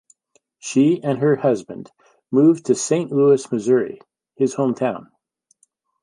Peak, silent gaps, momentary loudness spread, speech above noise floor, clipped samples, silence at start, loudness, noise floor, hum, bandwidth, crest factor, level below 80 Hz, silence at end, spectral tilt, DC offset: -4 dBFS; none; 17 LU; 47 dB; under 0.1%; 0.65 s; -19 LUFS; -65 dBFS; none; 11.5 kHz; 16 dB; -70 dBFS; 1 s; -6 dB/octave; under 0.1%